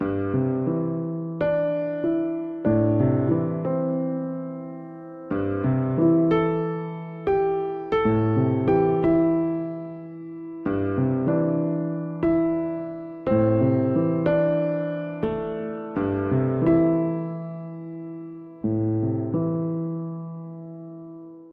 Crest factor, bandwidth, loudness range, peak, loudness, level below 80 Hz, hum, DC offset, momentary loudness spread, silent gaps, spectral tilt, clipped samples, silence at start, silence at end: 16 dB; 4.3 kHz; 3 LU; -8 dBFS; -24 LUFS; -52 dBFS; none; under 0.1%; 16 LU; none; -11.5 dB/octave; under 0.1%; 0 s; 0 s